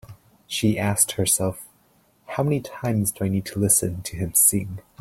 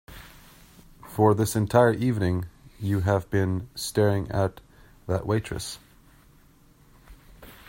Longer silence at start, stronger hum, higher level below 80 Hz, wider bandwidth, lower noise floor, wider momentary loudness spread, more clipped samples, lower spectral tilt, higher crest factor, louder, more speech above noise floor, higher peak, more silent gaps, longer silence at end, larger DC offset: about the same, 0.1 s vs 0.1 s; neither; about the same, -52 dBFS vs -50 dBFS; about the same, 16.5 kHz vs 16.5 kHz; first, -61 dBFS vs -56 dBFS; second, 13 LU vs 17 LU; neither; second, -4 dB/octave vs -6.5 dB/octave; about the same, 20 dB vs 20 dB; first, -21 LUFS vs -25 LUFS; first, 38 dB vs 32 dB; about the same, -4 dBFS vs -6 dBFS; neither; about the same, 0.2 s vs 0.15 s; neither